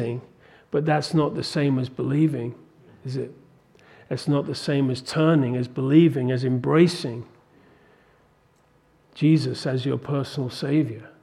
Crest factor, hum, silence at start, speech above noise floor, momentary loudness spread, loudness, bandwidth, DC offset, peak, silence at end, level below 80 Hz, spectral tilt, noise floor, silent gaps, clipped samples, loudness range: 20 dB; none; 0 s; 38 dB; 13 LU; -23 LUFS; 12 kHz; under 0.1%; -4 dBFS; 0.15 s; -64 dBFS; -7 dB/octave; -60 dBFS; none; under 0.1%; 6 LU